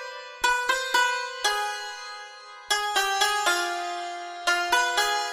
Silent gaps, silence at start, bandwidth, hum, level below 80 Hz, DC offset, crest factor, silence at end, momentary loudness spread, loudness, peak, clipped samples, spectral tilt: none; 0 s; 15 kHz; none; -60 dBFS; under 0.1%; 18 dB; 0 s; 15 LU; -25 LUFS; -8 dBFS; under 0.1%; 1.5 dB/octave